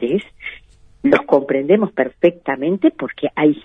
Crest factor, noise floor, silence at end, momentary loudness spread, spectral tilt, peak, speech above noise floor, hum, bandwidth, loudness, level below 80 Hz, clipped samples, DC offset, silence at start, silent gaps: 16 dB; -46 dBFS; 0.05 s; 9 LU; -8.5 dB/octave; 0 dBFS; 29 dB; none; 6 kHz; -17 LUFS; -54 dBFS; under 0.1%; under 0.1%; 0 s; none